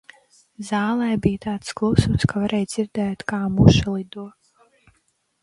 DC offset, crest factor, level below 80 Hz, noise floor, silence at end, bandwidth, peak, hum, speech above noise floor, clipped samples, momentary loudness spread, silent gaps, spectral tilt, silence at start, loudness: under 0.1%; 22 dB; -38 dBFS; -67 dBFS; 1.15 s; 11.5 kHz; 0 dBFS; none; 47 dB; under 0.1%; 15 LU; none; -6.5 dB/octave; 0.6 s; -21 LUFS